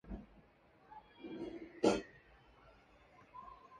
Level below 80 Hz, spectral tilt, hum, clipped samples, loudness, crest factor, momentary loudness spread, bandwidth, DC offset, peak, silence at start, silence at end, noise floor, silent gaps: -62 dBFS; -5 dB/octave; none; under 0.1%; -40 LUFS; 26 dB; 24 LU; 10 kHz; under 0.1%; -18 dBFS; 0.05 s; 0 s; -67 dBFS; none